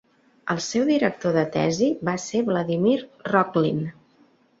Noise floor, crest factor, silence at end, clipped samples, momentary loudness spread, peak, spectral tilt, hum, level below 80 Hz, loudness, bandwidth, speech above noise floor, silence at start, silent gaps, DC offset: -59 dBFS; 20 dB; 0.7 s; under 0.1%; 7 LU; -4 dBFS; -5.5 dB/octave; none; -62 dBFS; -23 LUFS; 8 kHz; 37 dB; 0.45 s; none; under 0.1%